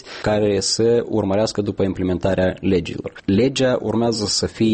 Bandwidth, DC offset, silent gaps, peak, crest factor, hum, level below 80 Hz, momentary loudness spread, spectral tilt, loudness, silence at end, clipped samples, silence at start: 8.8 kHz; under 0.1%; none; -6 dBFS; 12 dB; none; -44 dBFS; 4 LU; -5 dB/octave; -19 LUFS; 0 s; under 0.1%; 0.05 s